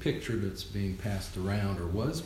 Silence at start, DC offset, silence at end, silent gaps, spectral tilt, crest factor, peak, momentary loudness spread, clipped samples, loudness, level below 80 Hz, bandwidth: 0 s; under 0.1%; 0 s; none; -6 dB/octave; 16 dB; -18 dBFS; 3 LU; under 0.1%; -34 LUFS; -46 dBFS; 15 kHz